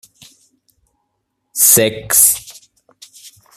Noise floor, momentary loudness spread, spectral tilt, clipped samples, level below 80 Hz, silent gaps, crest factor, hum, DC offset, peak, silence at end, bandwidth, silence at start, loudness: -71 dBFS; 12 LU; -1.5 dB/octave; under 0.1%; -54 dBFS; none; 18 dB; none; under 0.1%; 0 dBFS; 1.05 s; over 20 kHz; 1.55 s; -10 LUFS